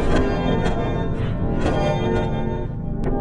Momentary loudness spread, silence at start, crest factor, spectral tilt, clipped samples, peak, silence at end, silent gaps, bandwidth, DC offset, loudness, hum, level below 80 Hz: 6 LU; 0 s; 14 dB; -7.5 dB/octave; under 0.1%; -8 dBFS; 0 s; none; 9.6 kHz; under 0.1%; -23 LUFS; none; -26 dBFS